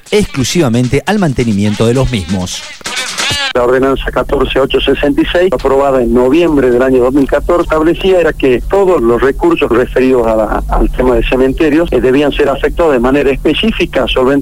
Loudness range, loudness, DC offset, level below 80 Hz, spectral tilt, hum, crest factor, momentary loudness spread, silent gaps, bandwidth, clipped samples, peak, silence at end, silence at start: 3 LU; -11 LUFS; 2%; -22 dBFS; -5.5 dB/octave; none; 10 dB; 4 LU; none; 16 kHz; under 0.1%; 0 dBFS; 0 s; 0.05 s